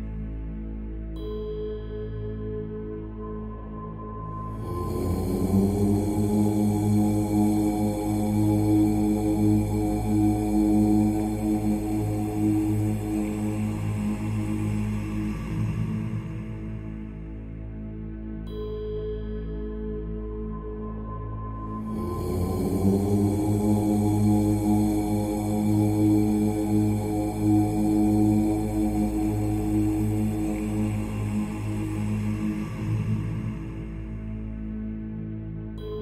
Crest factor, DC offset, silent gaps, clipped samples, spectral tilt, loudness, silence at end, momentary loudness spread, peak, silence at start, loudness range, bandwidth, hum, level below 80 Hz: 16 dB; under 0.1%; none; under 0.1%; -8 dB/octave; -26 LUFS; 0 s; 13 LU; -10 dBFS; 0 s; 11 LU; 15 kHz; none; -38 dBFS